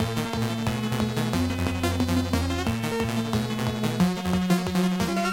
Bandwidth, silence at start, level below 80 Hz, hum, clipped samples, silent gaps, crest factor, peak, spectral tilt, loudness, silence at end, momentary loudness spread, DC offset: 17 kHz; 0 s; -42 dBFS; none; under 0.1%; none; 18 dB; -8 dBFS; -5.5 dB/octave; -26 LUFS; 0 s; 3 LU; under 0.1%